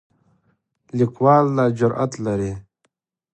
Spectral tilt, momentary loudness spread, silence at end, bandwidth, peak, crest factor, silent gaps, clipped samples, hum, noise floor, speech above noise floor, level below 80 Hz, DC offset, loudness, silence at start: -8 dB/octave; 14 LU; 0.7 s; 9.2 kHz; -2 dBFS; 20 dB; none; under 0.1%; none; -71 dBFS; 53 dB; -52 dBFS; under 0.1%; -19 LUFS; 0.95 s